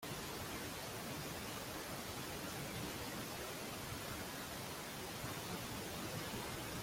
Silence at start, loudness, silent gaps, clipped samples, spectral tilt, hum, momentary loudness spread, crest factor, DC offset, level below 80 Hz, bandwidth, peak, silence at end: 0 s; -45 LUFS; none; under 0.1%; -3.5 dB/octave; none; 1 LU; 14 dB; under 0.1%; -62 dBFS; 16.5 kHz; -32 dBFS; 0 s